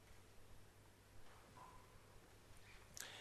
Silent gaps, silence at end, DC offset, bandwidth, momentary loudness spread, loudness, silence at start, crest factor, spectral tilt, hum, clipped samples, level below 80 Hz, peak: none; 0 s; under 0.1%; 13 kHz; 10 LU; -63 LUFS; 0 s; 34 dB; -2.5 dB/octave; 50 Hz at -75 dBFS; under 0.1%; -70 dBFS; -26 dBFS